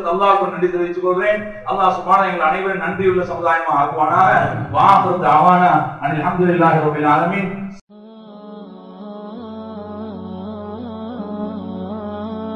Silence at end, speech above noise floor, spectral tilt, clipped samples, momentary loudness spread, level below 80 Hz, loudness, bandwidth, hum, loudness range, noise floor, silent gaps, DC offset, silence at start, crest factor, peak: 0 s; 24 dB; -7.5 dB/octave; under 0.1%; 19 LU; -50 dBFS; -16 LUFS; 10.5 kHz; none; 17 LU; -39 dBFS; 7.81-7.87 s; under 0.1%; 0 s; 18 dB; 0 dBFS